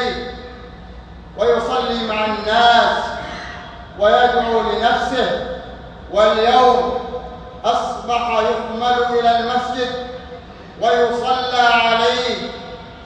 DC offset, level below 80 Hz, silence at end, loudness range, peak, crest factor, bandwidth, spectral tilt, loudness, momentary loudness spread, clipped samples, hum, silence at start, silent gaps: under 0.1%; -42 dBFS; 0 s; 3 LU; -2 dBFS; 16 dB; 9.2 kHz; -4 dB/octave; -17 LUFS; 21 LU; under 0.1%; none; 0 s; none